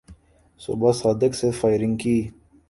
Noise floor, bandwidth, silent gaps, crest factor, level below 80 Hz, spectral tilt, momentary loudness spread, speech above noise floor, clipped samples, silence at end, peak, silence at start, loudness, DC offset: -50 dBFS; 11.5 kHz; none; 18 dB; -50 dBFS; -6.5 dB/octave; 12 LU; 29 dB; under 0.1%; 0.4 s; -4 dBFS; 0.1 s; -22 LUFS; under 0.1%